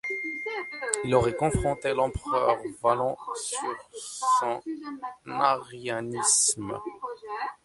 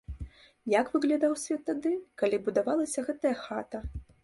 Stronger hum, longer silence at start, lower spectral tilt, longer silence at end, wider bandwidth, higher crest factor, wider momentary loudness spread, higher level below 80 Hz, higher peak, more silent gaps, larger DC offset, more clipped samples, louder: neither; about the same, 0.05 s vs 0.1 s; second, -3 dB/octave vs -5 dB/octave; about the same, 0.1 s vs 0.2 s; about the same, 11.5 kHz vs 11.5 kHz; about the same, 22 dB vs 18 dB; second, 13 LU vs 16 LU; about the same, -48 dBFS vs -50 dBFS; first, -6 dBFS vs -12 dBFS; neither; neither; neither; first, -27 LUFS vs -30 LUFS